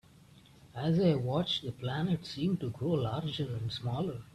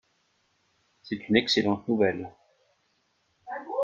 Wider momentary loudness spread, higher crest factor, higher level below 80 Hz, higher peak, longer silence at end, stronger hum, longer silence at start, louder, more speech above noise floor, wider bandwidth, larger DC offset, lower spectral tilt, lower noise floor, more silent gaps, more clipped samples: second, 8 LU vs 17 LU; second, 16 dB vs 24 dB; about the same, -62 dBFS vs -64 dBFS; second, -18 dBFS vs -6 dBFS; about the same, 0.1 s vs 0 s; neither; second, 0.35 s vs 1.05 s; second, -33 LUFS vs -26 LUFS; second, 26 dB vs 46 dB; first, 12 kHz vs 7.8 kHz; neither; first, -7.5 dB/octave vs -5 dB/octave; second, -58 dBFS vs -72 dBFS; neither; neither